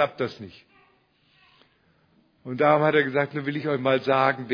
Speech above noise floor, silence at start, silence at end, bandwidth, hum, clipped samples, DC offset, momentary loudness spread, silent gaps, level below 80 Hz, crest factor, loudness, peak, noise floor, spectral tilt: 40 dB; 0 s; 0 s; 5.4 kHz; none; under 0.1%; under 0.1%; 20 LU; none; -72 dBFS; 20 dB; -23 LUFS; -4 dBFS; -64 dBFS; -8 dB/octave